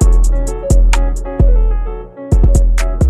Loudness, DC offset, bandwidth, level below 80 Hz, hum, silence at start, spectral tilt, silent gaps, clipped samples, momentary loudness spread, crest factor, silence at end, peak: -15 LUFS; under 0.1%; 11 kHz; -10 dBFS; none; 0 s; -6.5 dB/octave; none; under 0.1%; 8 LU; 10 dB; 0 s; 0 dBFS